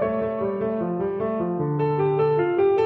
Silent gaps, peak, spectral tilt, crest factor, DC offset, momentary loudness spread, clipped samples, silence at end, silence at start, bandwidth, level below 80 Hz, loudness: none; -10 dBFS; -10.5 dB/octave; 12 dB; under 0.1%; 5 LU; under 0.1%; 0 s; 0 s; 4.3 kHz; -56 dBFS; -23 LUFS